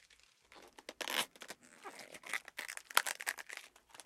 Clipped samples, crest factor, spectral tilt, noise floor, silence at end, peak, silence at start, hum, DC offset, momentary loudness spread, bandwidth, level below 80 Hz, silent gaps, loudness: under 0.1%; 36 dB; 1 dB/octave; -67 dBFS; 0 s; -6 dBFS; 0.1 s; none; under 0.1%; 19 LU; 16.5 kHz; -84 dBFS; none; -39 LUFS